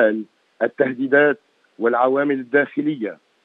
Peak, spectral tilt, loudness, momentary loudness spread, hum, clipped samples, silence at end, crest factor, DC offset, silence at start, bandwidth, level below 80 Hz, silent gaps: -2 dBFS; -8.5 dB/octave; -20 LUFS; 13 LU; none; under 0.1%; 0.3 s; 18 dB; under 0.1%; 0 s; 4.1 kHz; -86 dBFS; none